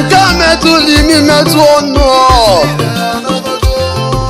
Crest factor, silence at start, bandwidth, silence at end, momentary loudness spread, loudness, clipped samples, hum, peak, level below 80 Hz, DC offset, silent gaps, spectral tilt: 8 dB; 0 s; 16.5 kHz; 0 s; 7 LU; -8 LUFS; 0.3%; none; 0 dBFS; -20 dBFS; under 0.1%; none; -4.5 dB/octave